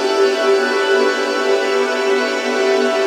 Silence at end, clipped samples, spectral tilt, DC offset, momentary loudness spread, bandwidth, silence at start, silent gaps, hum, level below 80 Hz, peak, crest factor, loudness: 0 s; under 0.1%; -1 dB/octave; under 0.1%; 2 LU; 14 kHz; 0 s; none; none; -88 dBFS; -4 dBFS; 12 dB; -16 LUFS